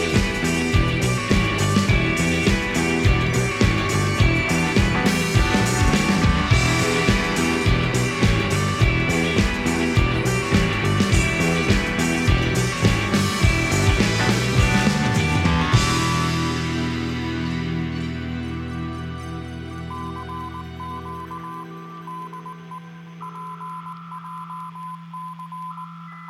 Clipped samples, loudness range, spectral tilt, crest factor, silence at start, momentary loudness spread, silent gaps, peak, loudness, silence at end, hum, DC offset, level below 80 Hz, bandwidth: under 0.1%; 16 LU; -5 dB/octave; 18 dB; 0 s; 16 LU; none; -4 dBFS; -20 LUFS; 0 s; none; under 0.1%; -30 dBFS; 15.5 kHz